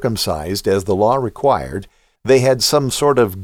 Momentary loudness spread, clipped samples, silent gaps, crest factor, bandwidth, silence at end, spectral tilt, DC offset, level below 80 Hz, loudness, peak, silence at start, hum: 8 LU; under 0.1%; none; 14 dB; 18 kHz; 0 s; -4.5 dB/octave; under 0.1%; -42 dBFS; -16 LUFS; -2 dBFS; 0 s; none